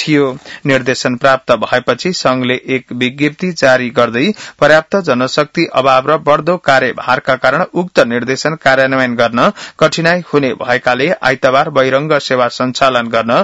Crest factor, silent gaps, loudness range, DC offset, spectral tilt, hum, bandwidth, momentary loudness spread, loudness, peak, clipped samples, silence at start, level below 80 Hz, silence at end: 12 dB; none; 2 LU; 0.2%; -5 dB/octave; none; 10 kHz; 4 LU; -12 LUFS; 0 dBFS; 0.4%; 0 s; -50 dBFS; 0 s